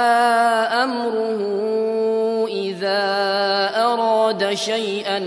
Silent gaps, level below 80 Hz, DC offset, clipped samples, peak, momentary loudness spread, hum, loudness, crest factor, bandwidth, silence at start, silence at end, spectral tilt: none; -74 dBFS; under 0.1%; under 0.1%; -6 dBFS; 6 LU; none; -19 LUFS; 14 dB; 11 kHz; 0 s; 0 s; -3.5 dB/octave